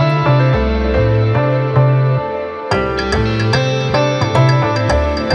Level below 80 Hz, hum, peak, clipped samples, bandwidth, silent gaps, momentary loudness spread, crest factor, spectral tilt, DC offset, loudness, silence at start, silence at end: -26 dBFS; none; -2 dBFS; under 0.1%; 9.2 kHz; none; 4 LU; 12 dB; -7 dB/octave; under 0.1%; -14 LUFS; 0 s; 0 s